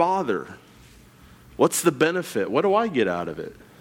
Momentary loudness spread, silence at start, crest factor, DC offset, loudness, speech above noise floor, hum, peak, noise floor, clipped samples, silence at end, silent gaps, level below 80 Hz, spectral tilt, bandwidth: 17 LU; 0 s; 18 dB; under 0.1%; -23 LUFS; 27 dB; none; -6 dBFS; -50 dBFS; under 0.1%; 0.25 s; none; -58 dBFS; -4.5 dB/octave; 18.5 kHz